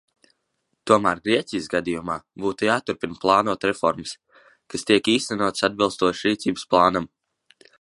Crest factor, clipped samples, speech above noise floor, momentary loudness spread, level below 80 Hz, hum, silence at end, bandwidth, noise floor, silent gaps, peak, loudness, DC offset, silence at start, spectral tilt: 22 dB; under 0.1%; 53 dB; 12 LU; -56 dBFS; none; 0.75 s; 11.5 kHz; -75 dBFS; none; -2 dBFS; -22 LUFS; under 0.1%; 0.85 s; -4 dB/octave